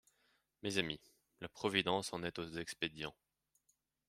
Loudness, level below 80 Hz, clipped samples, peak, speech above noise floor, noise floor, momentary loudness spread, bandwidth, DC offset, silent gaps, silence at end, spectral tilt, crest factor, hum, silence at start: -40 LUFS; -72 dBFS; under 0.1%; -16 dBFS; 41 dB; -81 dBFS; 13 LU; 16 kHz; under 0.1%; none; 1 s; -3.5 dB/octave; 26 dB; none; 0.65 s